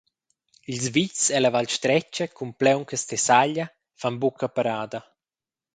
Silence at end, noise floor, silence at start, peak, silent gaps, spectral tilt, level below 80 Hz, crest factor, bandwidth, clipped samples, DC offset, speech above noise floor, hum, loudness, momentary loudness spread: 0.75 s; under -90 dBFS; 0.7 s; -2 dBFS; none; -3.5 dB/octave; -68 dBFS; 22 dB; 9.6 kHz; under 0.1%; under 0.1%; over 66 dB; none; -23 LUFS; 13 LU